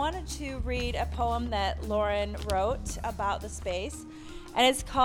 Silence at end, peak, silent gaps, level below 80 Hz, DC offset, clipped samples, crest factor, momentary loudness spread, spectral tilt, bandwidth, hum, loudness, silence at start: 0 s; -10 dBFS; none; -38 dBFS; under 0.1%; under 0.1%; 20 dB; 11 LU; -4 dB/octave; 17 kHz; none; -30 LUFS; 0 s